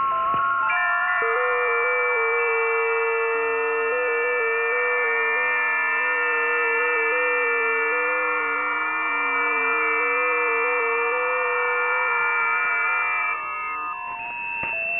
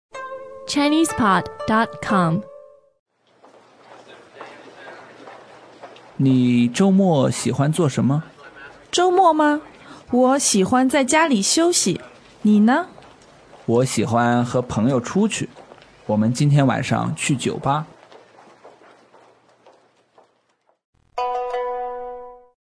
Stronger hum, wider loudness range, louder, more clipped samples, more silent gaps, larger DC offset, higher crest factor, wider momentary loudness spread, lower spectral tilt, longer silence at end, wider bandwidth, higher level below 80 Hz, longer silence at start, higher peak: neither; second, 1 LU vs 13 LU; about the same, -21 LUFS vs -19 LUFS; neither; second, none vs 2.99-3.06 s, 20.85-20.93 s; first, 0.1% vs under 0.1%; second, 12 dB vs 18 dB; second, 3 LU vs 20 LU; about the same, -6 dB/octave vs -5 dB/octave; second, 0 s vs 0.4 s; second, 3.9 kHz vs 11 kHz; second, -66 dBFS vs -56 dBFS; second, 0 s vs 0.15 s; second, -10 dBFS vs -4 dBFS